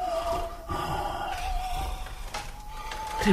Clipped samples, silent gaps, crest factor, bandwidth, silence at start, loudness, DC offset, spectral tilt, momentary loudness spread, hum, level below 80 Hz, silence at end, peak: under 0.1%; none; 22 dB; 15.5 kHz; 0 s; -33 LUFS; under 0.1%; -5 dB/octave; 9 LU; none; -36 dBFS; 0 s; -10 dBFS